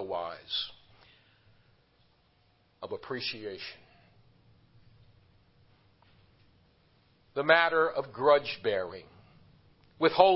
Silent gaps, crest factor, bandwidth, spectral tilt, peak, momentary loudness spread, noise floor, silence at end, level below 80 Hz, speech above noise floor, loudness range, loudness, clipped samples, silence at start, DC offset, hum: none; 26 dB; 5.8 kHz; -7.5 dB/octave; -6 dBFS; 18 LU; -68 dBFS; 0 s; -68 dBFS; 40 dB; 14 LU; -29 LUFS; under 0.1%; 0 s; under 0.1%; none